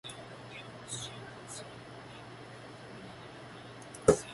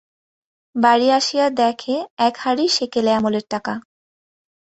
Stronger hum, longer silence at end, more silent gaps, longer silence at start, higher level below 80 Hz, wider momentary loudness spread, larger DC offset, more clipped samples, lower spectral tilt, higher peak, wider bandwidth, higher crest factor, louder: neither; second, 0 s vs 0.85 s; second, none vs 2.10-2.17 s; second, 0.05 s vs 0.75 s; first, -58 dBFS vs -64 dBFS; first, 19 LU vs 10 LU; neither; neither; about the same, -4.5 dB/octave vs -3.5 dB/octave; second, -8 dBFS vs -2 dBFS; first, 11.5 kHz vs 8.4 kHz; first, 30 dB vs 18 dB; second, -39 LUFS vs -18 LUFS